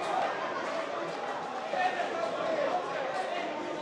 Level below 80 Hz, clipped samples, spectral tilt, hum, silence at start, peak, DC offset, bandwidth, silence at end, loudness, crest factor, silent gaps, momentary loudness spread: -80 dBFS; under 0.1%; -3.5 dB/octave; none; 0 s; -18 dBFS; under 0.1%; 11.5 kHz; 0 s; -33 LUFS; 14 dB; none; 5 LU